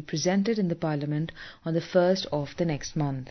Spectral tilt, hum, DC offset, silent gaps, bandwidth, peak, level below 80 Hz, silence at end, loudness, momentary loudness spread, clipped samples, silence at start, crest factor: -6 dB/octave; none; under 0.1%; none; 6.4 kHz; -10 dBFS; -56 dBFS; 0 s; -28 LUFS; 8 LU; under 0.1%; 0 s; 18 dB